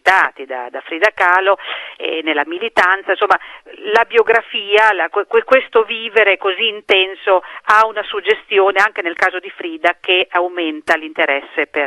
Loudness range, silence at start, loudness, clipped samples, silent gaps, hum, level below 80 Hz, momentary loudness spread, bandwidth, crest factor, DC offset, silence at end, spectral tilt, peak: 2 LU; 0.05 s; -15 LUFS; under 0.1%; none; none; -62 dBFS; 9 LU; 12.5 kHz; 16 dB; under 0.1%; 0 s; -2 dB/octave; 0 dBFS